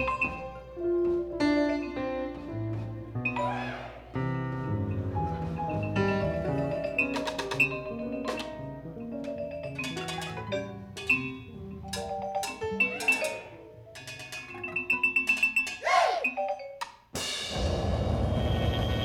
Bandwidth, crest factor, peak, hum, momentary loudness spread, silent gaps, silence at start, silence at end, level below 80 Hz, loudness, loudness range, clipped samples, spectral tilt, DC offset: 18 kHz; 20 dB; -12 dBFS; none; 14 LU; none; 0 s; 0 s; -44 dBFS; -30 LUFS; 6 LU; under 0.1%; -5 dB/octave; under 0.1%